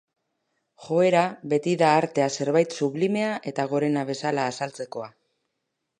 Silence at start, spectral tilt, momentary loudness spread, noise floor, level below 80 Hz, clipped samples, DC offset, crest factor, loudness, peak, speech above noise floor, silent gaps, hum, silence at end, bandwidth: 0.8 s; -5.5 dB/octave; 12 LU; -80 dBFS; -76 dBFS; under 0.1%; under 0.1%; 20 dB; -24 LUFS; -6 dBFS; 56 dB; none; none; 0.9 s; 11 kHz